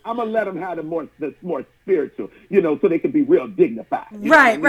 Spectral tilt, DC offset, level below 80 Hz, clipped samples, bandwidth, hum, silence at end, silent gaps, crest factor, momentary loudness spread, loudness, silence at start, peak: -6 dB/octave; under 0.1%; -60 dBFS; under 0.1%; 13 kHz; none; 0 s; none; 16 dB; 14 LU; -20 LUFS; 0.05 s; -2 dBFS